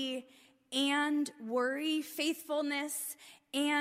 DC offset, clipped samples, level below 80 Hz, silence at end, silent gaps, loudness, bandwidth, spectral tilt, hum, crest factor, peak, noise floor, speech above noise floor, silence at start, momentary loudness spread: under 0.1%; under 0.1%; -88 dBFS; 0 s; none; -34 LUFS; 16 kHz; -1 dB/octave; none; 14 dB; -20 dBFS; -63 dBFS; 29 dB; 0 s; 9 LU